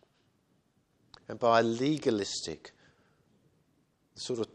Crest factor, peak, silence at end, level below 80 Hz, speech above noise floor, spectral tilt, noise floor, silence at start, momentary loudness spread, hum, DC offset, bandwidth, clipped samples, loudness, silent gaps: 22 dB; -10 dBFS; 0.1 s; -70 dBFS; 42 dB; -4.5 dB/octave; -72 dBFS; 1.3 s; 20 LU; none; under 0.1%; 11 kHz; under 0.1%; -30 LUFS; none